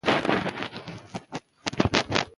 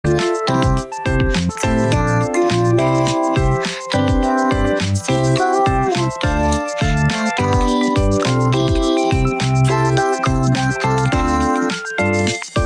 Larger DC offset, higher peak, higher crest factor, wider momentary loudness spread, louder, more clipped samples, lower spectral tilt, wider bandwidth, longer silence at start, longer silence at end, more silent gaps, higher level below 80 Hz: neither; first, 0 dBFS vs -6 dBFS; first, 28 dB vs 10 dB; first, 16 LU vs 3 LU; second, -27 LUFS vs -17 LUFS; neither; about the same, -4.5 dB/octave vs -5.5 dB/octave; about the same, 11.5 kHz vs 11 kHz; about the same, 0.05 s vs 0.05 s; about the same, 0.1 s vs 0 s; neither; second, -48 dBFS vs -28 dBFS